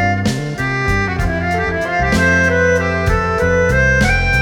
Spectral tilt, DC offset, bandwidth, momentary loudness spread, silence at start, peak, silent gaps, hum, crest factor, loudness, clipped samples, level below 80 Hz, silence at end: -5.5 dB/octave; under 0.1%; 17 kHz; 6 LU; 0 s; -2 dBFS; none; none; 12 dB; -15 LUFS; under 0.1%; -24 dBFS; 0 s